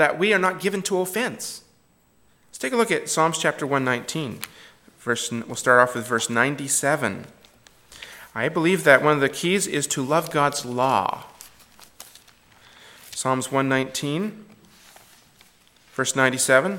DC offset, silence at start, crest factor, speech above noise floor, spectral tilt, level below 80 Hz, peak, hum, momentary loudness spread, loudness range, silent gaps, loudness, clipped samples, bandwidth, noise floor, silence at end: under 0.1%; 0 s; 24 dB; 38 dB; -3.5 dB/octave; -66 dBFS; 0 dBFS; none; 17 LU; 7 LU; none; -22 LUFS; under 0.1%; 17.5 kHz; -60 dBFS; 0 s